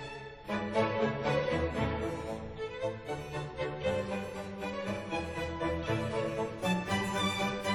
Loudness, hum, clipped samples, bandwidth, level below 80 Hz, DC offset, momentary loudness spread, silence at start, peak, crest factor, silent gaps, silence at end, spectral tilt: -34 LUFS; none; under 0.1%; 17.5 kHz; -50 dBFS; under 0.1%; 9 LU; 0 s; -16 dBFS; 18 dB; none; 0 s; -5.5 dB/octave